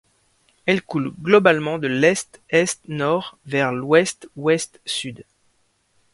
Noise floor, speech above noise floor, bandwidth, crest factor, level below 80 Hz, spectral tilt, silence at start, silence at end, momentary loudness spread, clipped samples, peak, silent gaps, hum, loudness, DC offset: -65 dBFS; 45 dB; 11.5 kHz; 22 dB; -62 dBFS; -4.5 dB/octave; 0.65 s; 0.9 s; 10 LU; under 0.1%; 0 dBFS; none; none; -20 LUFS; under 0.1%